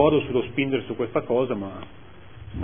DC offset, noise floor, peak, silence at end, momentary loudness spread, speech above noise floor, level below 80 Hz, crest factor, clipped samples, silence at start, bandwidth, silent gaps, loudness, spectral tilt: 0.5%; -43 dBFS; -4 dBFS; 0 s; 18 LU; 19 dB; -48 dBFS; 20 dB; under 0.1%; 0 s; 3.6 kHz; none; -25 LUFS; -11 dB/octave